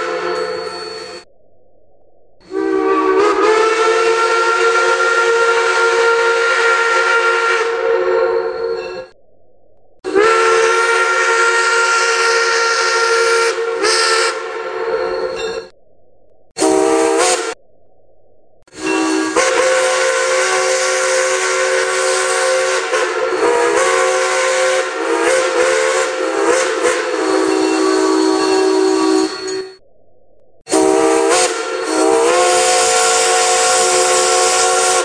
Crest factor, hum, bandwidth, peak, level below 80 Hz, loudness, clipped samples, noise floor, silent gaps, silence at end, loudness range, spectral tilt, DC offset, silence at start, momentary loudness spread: 14 dB; none; 11 kHz; 0 dBFS; -56 dBFS; -13 LUFS; under 0.1%; -53 dBFS; 16.51-16.55 s; 0 s; 5 LU; -0.5 dB/octave; under 0.1%; 0 s; 9 LU